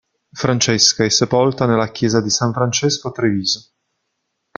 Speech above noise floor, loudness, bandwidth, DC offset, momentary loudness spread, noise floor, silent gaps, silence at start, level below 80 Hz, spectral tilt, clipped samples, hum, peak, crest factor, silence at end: 57 dB; -16 LUFS; 10 kHz; under 0.1%; 7 LU; -73 dBFS; none; 0.35 s; -52 dBFS; -3.5 dB/octave; under 0.1%; none; 0 dBFS; 18 dB; 0.95 s